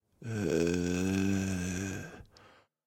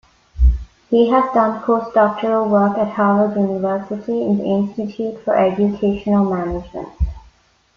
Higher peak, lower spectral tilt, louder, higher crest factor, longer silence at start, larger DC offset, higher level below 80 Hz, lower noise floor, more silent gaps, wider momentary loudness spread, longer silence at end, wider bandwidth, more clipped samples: second, -18 dBFS vs -2 dBFS; second, -5.5 dB/octave vs -9 dB/octave; second, -33 LUFS vs -18 LUFS; about the same, 16 dB vs 14 dB; second, 0.2 s vs 0.35 s; neither; second, -58 dBFS vs -26 dBFS; first, -61 dBFS vs -53 dBFS; neither; first, 13 LU vs 10 LU; about the same, 0.6 s vs 0.55 s; first, 16.5 kHz vs 6.4 kHz; neither